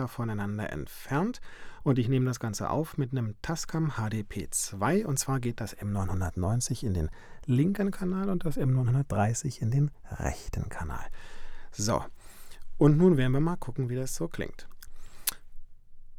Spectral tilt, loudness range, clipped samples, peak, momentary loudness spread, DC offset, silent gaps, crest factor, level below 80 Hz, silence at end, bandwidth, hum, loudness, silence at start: -6 dB/octave; 3 LU; under 0.1%; -4 dBFS; 12 LU; under 0.1%; none; 24 dB; -44 dBFS; 0 s; 20 kHz; none; -30 LUFS; 0 s